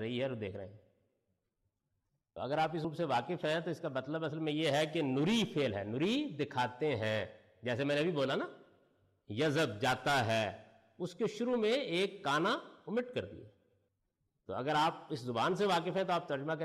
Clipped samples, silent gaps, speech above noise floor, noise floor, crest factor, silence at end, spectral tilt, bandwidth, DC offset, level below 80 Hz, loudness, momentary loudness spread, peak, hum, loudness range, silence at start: under 0.1%; none; 49 dB; -84 dBFS; 12 dB; 0 s; -5.5 dB/octave; 14 kHz; under 0.1%; -74 dBFS; -35 LUFS; 12 LU; -24 dBFS; none; 4 LU; 0 s